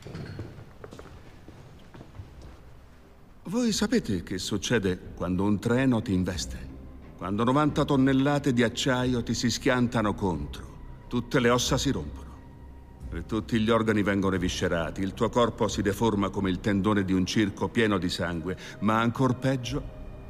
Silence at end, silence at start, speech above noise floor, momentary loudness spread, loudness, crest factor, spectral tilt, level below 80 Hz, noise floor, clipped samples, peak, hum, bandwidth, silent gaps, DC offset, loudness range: 0 s; 0 s; 26 dB; 20 LU; -27 LUFS; 16 dB; -5.5 dB/octave; -44 dBFS; -52 dBFS; under 0.1%; -10 dBFS; none; 15.5 kHz; none; 0.1%; 5 LU